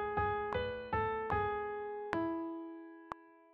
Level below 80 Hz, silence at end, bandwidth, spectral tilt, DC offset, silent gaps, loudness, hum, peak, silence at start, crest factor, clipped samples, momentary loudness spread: -56 dBFS; 0.15 s; 6.8 kHz; -4.5 dB/octave; under 0.1%; none; -37 LUFS; none; -16 dBFS; 0 s; 22 dB; under 0.1%; 14 LU